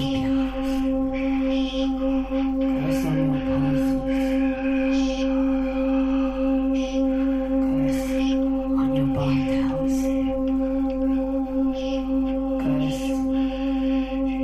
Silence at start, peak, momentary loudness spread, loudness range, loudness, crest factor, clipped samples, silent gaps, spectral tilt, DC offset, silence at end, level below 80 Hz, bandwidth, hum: 0 s; -12 dBFS; 2 LU; 1 LU; -23 LUFS; 10 dB; under 0.1%; none; -7 dB/octave; under 0.1%; 0 s; -36 dBFS; 12.5 kHz; none